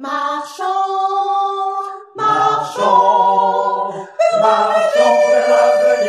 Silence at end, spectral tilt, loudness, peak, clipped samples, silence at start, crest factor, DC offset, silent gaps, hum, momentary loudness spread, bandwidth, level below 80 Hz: 0 s; -3.5 dB/octave; -15 LUFS; 0 dBFS; under 0.1%; 0 s; 14 dB; under 0.1%; none; none; 10 LU; 12.5 kHz; -70 dBFS